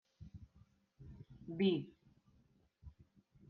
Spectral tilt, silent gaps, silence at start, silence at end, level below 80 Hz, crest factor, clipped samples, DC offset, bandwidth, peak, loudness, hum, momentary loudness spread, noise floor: -6 dB/octave; none; 0.2 s; 0.6 s; -68 dBFS; 24 dB; under 0.1%; under 0.1%; 5 kHz; -22 dBFS; -38 LUFS; none; 26 LU; -73 dBFS